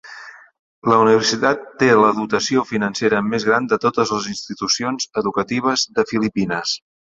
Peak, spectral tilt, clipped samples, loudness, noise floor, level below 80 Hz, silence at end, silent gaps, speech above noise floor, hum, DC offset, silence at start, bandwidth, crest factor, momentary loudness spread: -2 dBFS; -4 dB/octave; under 0.1%; -18 LUFS; -39 dBFS; -56 dBFS; 0.35 s; 0.59-0.82 s; 21 dB; none; under 0.1%; 0.05 s; 7.8 kHz; 18 dB; 10 LU